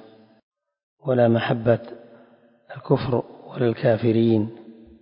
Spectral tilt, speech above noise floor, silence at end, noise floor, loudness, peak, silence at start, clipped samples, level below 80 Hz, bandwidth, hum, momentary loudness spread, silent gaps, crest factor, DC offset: -12 dB/octave; 34 dB; 0.3 s; -54 dBFS; -22 LUFS; -4 dBFS; 1.05 s; under 0.1%; -56 dBFS; 5.4 kHz; none; 17 LU; none; 20 dB; under 0.1%